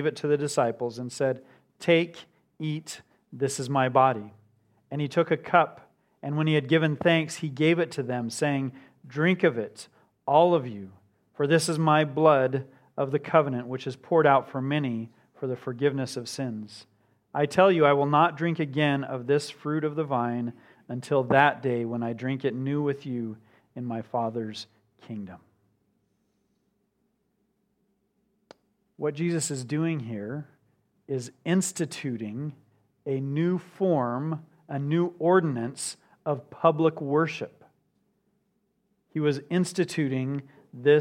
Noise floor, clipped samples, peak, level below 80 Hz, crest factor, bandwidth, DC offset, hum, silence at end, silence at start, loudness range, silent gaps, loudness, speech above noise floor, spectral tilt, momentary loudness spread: -74 dBFS; under 0.1%; -4 dBFS; -74 dBFS; 22 dB; 15 kHz; under 0.1%; none; 0 s; 0 s; 8 LU; none; -26 LUFS; 48 dB; -6 dB/octave; 16 LU